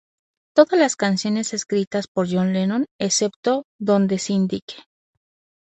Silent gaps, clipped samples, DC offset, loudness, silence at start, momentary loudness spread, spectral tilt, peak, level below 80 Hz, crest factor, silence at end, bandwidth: 1.87-1.91 s, 2.08-2.15 s, 2.91-2.99 s, 3.36-3.43 s, 3.64-3.79 s, 4.62-4.68 s; under 0.1%; under 0.1%; -21 LUFS; 0.55 s; 7 LU; -4.5 dB/octave; -2 dBFS; -64 dBFS; 20 dB; 0.9 s; 8.6 kHz